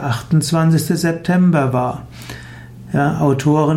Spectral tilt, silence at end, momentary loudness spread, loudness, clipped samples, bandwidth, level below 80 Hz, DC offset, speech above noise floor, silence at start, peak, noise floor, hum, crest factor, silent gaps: -6.5 dB/octave; 0 s; 18 LU; -16 LUFS; under 0.1%; 15.5 kHz; -46 dBFS; under 0.1%; 20 dB; 0 s; -4 dBFS; -35 dBFS; none; 12 dB; none